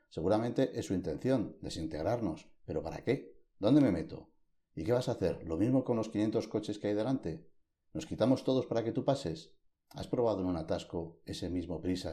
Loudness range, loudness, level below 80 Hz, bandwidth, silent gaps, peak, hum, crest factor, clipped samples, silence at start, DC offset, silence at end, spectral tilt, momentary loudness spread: 3 LU; -34 LUFS; -58 dBFS; 12.5 kHz; none; -14 dBFS; none; 20 dB; under 0.1%; 0.15 s; under 0.1%; 0 s; -7 dB/octave; 13 LU